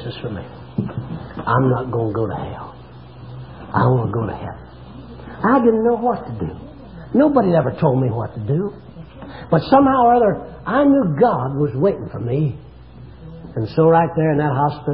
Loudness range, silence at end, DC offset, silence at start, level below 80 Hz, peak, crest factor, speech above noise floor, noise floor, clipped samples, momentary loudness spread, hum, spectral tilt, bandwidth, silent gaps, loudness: 7 LU; 0 s; 0.3%; 0 s; -44 dBFS; 0 dBFS; 18 dB; 22 dB; -39 dBFS; under 0.1%; 23 LU; none; -13 dB/octave; 5.4 kHz; none; -18 LUFS